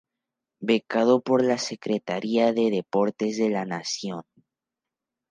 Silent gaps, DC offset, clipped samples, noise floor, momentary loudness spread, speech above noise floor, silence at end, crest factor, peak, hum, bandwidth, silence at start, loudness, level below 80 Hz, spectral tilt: none; under 0.1%; under 0.1%; -88 dBFS; 9 LU; 64 dB; 1.1 s; 18 dB; -8 dBFS; none; 9.8 kHz; 0.6 s; -25 LUFS; -76 dBFS; -5 dB/octave